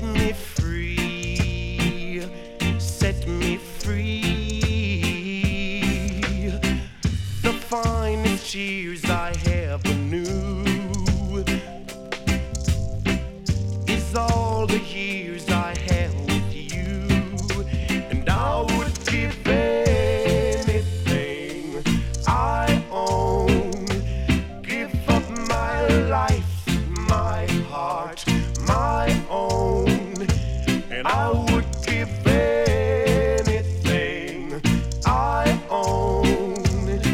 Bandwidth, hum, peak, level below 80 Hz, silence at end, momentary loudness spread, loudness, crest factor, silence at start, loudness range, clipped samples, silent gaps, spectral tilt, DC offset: 16.5 kHz; none; -8 dBFS; -30 dBFS; 0 s; 6 LU; -23 LUFS; 14 dB; 0 s; 4 LU; under 0.1%; none; -5.5 dB/octave; under 0.1%